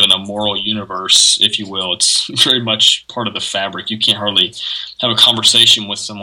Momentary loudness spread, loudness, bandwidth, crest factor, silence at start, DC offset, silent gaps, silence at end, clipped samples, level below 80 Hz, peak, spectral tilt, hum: 12 LU; -12 LUFS; over 20 kHz; 14 dB; 0 s; under 0.1%; none; 0 s; 0.1%; -56 dBFS; 0 dBFS; -1 dB/octave; none